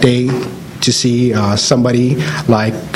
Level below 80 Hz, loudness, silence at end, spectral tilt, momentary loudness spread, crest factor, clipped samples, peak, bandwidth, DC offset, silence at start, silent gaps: -44 dBFS; -13 LUFS; 0 s; -5 dB/octave; 6 LU; 14 dB; 0.1%; 0 dBFS; 15 kHz; under 0.1%; 0 s; none